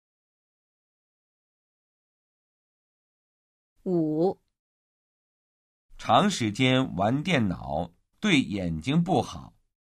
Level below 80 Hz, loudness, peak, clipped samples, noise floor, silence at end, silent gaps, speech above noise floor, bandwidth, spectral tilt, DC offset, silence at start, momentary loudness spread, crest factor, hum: -54 dBFS; -26 LUFS; -6 dBFS; under 0.1%; under -90 dBFS; 0.45 s; 4.59-5.89 s; over 65 dB; 12 kHz; -5.5 dB/octave; under 0.1%; 3.85 s; 15 LU; 22 dB; none